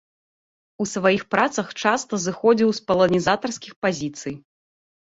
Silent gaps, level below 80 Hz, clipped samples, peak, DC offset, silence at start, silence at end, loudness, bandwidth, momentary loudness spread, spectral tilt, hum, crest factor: 3.76-3.82 s; -58 dBFS; under 0.1%; -4 dBFS; under 0.1%; 0.8 s; 0.7 s; -21 LUFS; 8 kHz; 12 LU; -4.5 dB/octave; none; 20 dB